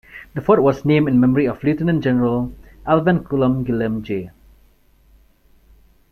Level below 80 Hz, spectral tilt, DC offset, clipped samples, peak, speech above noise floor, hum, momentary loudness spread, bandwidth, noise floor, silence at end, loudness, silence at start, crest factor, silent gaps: -44 dBFS; -9.5 dB/octave; under 0.1%; under 0.1%; -2 dBFS; 37 dB; none; 12 LU; 13.5 kHz; -53 dBFS; 1.85 s; -18 LUFS; 0.15 s; 18 dB; none